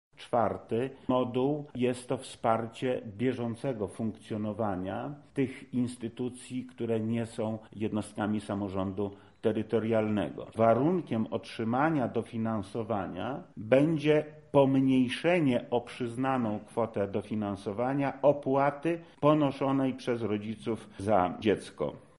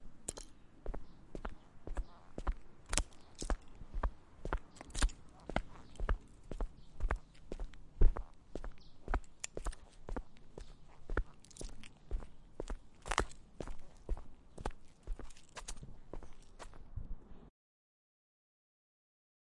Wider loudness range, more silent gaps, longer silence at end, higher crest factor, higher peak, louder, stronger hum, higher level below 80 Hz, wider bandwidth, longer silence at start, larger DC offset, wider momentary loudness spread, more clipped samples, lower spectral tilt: second, 6 LU vs 10 LU; neither; second, 0.2 s vs 2 s; second, 22 dB vs 30 dB; about the same, -8 dBFS vs -10 dBFS; first, -31 LUFS vs -45 LUFS; neither; second, -66 dBFS vs -42 dBFS; about the same, 11.5 kHz vs 11.5 kHz; first, 0.2 s vs 0 s; neither; second, 10 LU vs 18 LU; neither; first, -7.5 dB/octave vs -4 dB/octave